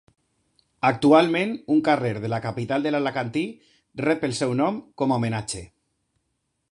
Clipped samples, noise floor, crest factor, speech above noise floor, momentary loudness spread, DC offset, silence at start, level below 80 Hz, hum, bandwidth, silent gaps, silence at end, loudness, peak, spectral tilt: under 0.1%; -75 dBFS; 20 dB; 53 dB; 12 LU; under 0.1%; 0.85 s; -58 dBFS; none; 11 kHz; none; 1.05 s; -23 LUFS; -4 dBFS; -6 dB/octave